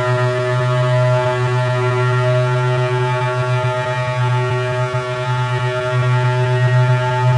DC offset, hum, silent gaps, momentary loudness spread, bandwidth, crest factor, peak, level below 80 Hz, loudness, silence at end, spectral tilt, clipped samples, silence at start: under 0.1%; none; none; 4 LU; 10 kHz; 12 dB; -4 dBFS; -50 dBFS; -17 LUFS; 0 s; -7 dB/octave; under 0.1%; 0 s